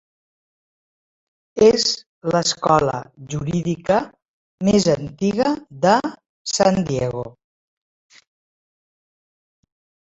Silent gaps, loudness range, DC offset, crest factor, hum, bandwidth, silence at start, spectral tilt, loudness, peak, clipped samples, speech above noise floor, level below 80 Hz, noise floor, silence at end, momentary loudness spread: 2.06-2.21 s, 4.28-4.58 s, 6.29-6.45 s; 6 LU; under 0.1%; 20 dB; none; 8 kHz; 1.55 s; -4.5 dB/octave; -19 LUFS; -2 dBFS; under 0.1%; over 71 dB; -52 dBFS; under -90 dBFS; 2.8 s; 15 LU